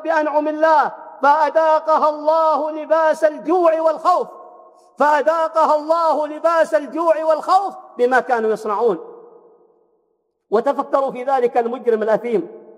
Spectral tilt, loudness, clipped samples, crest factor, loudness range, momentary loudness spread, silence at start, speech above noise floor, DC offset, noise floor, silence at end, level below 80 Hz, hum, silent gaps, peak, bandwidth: -5 dB/octave; -17 LUFS; under 0.1%; 14 dB; 5 LU; 5 LU; 0 s; 51 dB; under 0.1%; -68 dBFS; 0.15 s; under -90 dBFS; none; none; -4 dBFS; 11.5 kHz